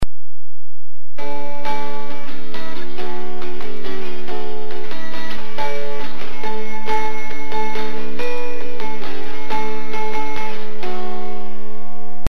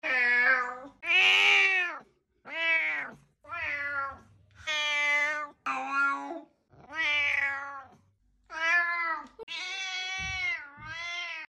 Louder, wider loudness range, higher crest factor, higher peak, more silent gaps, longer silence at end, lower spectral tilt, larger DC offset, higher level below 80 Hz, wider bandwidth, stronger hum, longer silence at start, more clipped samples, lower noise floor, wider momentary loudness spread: about the same, -29 LUFS vs -27 LUFS; about the same, 4 LU vs 6 LU; about the same, 22 dB vs 20 dB; first, -2 dBFS vs -10 dBFS; second, none vs 9.43-9.47 s; about the same, 0 s vs 0 s; first, -6 dB/octave vs -0.5 dB/octave; first, 50% vs under 0.1%; first, -44 dBFS vs -62 dBFS; about the same, 13.5 kHz vs 13 kHz; neither; about the same, 0 s vs 0.05 s; neither; first, under -90 dBFS vs -67 dBFS; second, 7 LU vs 18 LU